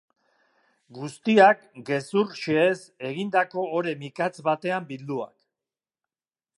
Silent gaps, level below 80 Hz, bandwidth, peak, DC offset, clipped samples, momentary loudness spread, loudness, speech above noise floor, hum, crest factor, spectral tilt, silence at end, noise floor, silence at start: none; -76 dBFS; 11.5 kHz; -4 dBFS; under 0.1%; under 0.1%; 15 LU; -24 LUFS; over 66 dB; none; 22 dB; -6 dB/octave; 1.3 s; under -90 dBFS; 0.9 s